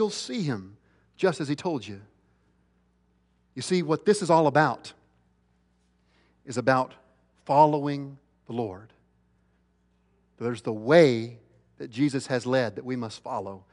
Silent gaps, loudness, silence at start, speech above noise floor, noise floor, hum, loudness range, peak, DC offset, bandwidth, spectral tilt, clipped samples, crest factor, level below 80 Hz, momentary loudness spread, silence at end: none; -26 LUFS; 0 s; 42 dB; -68 dBFS; none; 6 LU; -6 dBFS; under 0.1%; 11 kHz; -6 dB/octave; under 0.1%; 22 dB; -70 dBFS; 19 LU; 0.15 s